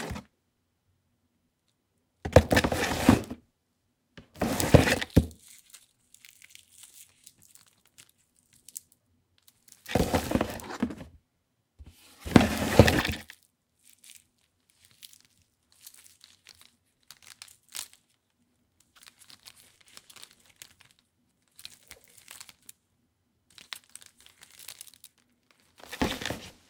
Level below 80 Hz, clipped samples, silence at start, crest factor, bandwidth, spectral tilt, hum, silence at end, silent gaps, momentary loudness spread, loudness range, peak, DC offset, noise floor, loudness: -46 dBFS; under 0.1%; 0 s; 32 dB; 18 kHz; -5.5 dB/octave; none; 0.2 s; none; 29 LU; 24 LU; 0 dBFS; under 0.1%; -76 dBFS; -26 LUFS